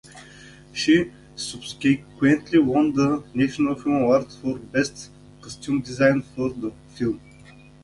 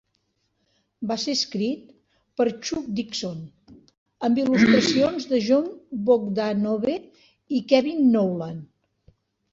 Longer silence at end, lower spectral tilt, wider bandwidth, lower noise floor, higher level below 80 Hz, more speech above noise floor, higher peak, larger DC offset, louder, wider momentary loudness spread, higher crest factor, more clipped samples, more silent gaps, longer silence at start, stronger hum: second, 0.65 s vs 0.85 s; about the same, -5.5 dB/octave vs -5 dB/octave; first, 11.5 kHz vs 7.8 kHz; second, -48 dBFS vs -72 dBFS; first, -54 dBFS vs -62 dBFS; second, 26 dB vs 50 dB; about the same, -4 dBFS vs -4 dBFS; neither; about the same, -23 LUFS vs -23 LUFS; about the same, 15 LU vs 15 LU; about the same, 20 dB vs 20 dB; neither; second, none vs 3.98-4.06 s; second, 0.15 s vs 1 s; neither